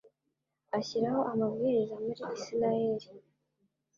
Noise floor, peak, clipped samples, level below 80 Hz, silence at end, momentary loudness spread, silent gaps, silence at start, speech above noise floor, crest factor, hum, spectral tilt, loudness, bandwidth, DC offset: -84 dBFS; -18 dBFS; under 0.1%; -74 dBFS; 0.8 s; 7 LU; none; 0.75 s; 52 dB; 16 dB; none; -6.5 dB/octave; -32 LUFS; 7.4 kHz; under 0.1%